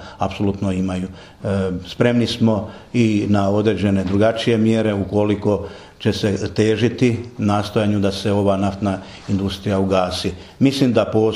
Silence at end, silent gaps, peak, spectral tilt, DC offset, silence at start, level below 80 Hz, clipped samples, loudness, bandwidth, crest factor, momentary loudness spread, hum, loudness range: 0 s; none; 0 dBFS; -6.5 dB/octave; under 0.1%; 0 s; -46 dBFS; under 0.1%; -19 LUFS; 12.5 kHz; 18 dB; 7 LU; none; 2 LU